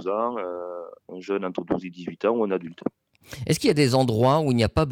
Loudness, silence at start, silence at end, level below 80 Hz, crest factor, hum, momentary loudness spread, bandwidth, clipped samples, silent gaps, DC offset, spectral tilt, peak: -24 LUFS; 0 s; 0 s; -46 dBFS; 14 dB; none; 16 LU; 17 kHz; under 0.1%; none; under 0.1%; -6 dB/octave; -10 dBFS